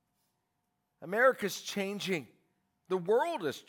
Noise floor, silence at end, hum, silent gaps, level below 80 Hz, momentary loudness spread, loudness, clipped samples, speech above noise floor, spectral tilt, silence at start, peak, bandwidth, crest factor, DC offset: -82 dBFS; 0.05 s; none; none; -86 dBFS; 10 LU; -32 LUFS; under 0.1%; 50 dB; -4 dB/octave; 1 s; -14 dBFS; 18 kHz; 20 dB; under 0.1%